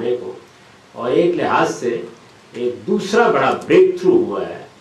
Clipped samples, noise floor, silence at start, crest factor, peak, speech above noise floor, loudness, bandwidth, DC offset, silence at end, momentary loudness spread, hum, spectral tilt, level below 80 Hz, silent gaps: under 0.1%; -46 dBFS; 0 s; 16 dB; -2 dBFS; 30 dB; -17 LUFS; 11.5 kHz; under 0.1%; 0.15 s; 14 LU; none; -5.5 dB/octave; -60 dBFS; none